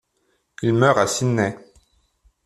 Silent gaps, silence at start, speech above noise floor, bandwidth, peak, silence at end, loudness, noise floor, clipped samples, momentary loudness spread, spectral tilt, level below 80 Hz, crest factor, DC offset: none; 0.6 s; 50 dB; 13.5 kHz; -2 dBFS; 0.9 s; -20 LUFS; -68 dBFS; under 0.1%; 9 LU; -5.5 dB/octave; -58 dBFS; 20 dB; under 0.1%